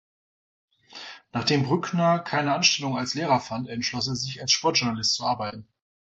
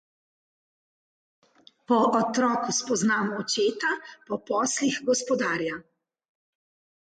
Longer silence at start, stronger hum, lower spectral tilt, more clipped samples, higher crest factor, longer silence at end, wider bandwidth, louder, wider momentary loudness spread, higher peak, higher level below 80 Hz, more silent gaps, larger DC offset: second, 0.9 s vs 1.9 s; neither; about the same, -3.5 dB/octave vs -3 dB/octave; neither; about the same, 20 dB vs 18 dB; second, 0.55 s vs 1.25 s; second, 8.2 kHz vs 9.4 kHz; about the same, -24 LUFS vs -25 LUFS; first, 13 LU vs 9 LU; first, -6 dBFS vs -10 dBFS; first, -60 dBFS vs -72 dBFS; neither; neither